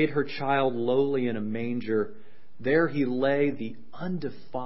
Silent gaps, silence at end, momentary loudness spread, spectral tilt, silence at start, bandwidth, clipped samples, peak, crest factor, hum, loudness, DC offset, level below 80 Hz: none; 0 s; 11 LU; -11 dB/octave; 0 s; 5.8 kHz; under 0.1%; -12 dBFS; 16 dB; none; -27 LUFS; 2%; -66 dBFS